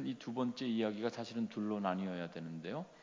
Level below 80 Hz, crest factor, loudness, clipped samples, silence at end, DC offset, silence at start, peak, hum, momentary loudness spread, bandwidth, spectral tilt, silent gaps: -80 dBFS; 18 dB; -40 LUFS; under 0.1%; 0 s; under 0.1%; 0 s; -20 dBFS; none; 8 LU; 7.6 kHz; -6.5 dB/octave; none